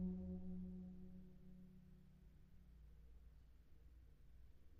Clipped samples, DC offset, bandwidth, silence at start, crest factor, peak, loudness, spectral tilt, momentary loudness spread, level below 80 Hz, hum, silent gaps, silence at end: under 0.1%; under 0.1%; 4.9 kHz; 0 s; 18 dB; -38 dBFS; -57 LUFS; -11 dB/octave; 18 LU; -64 dBFS; none; none; 0 s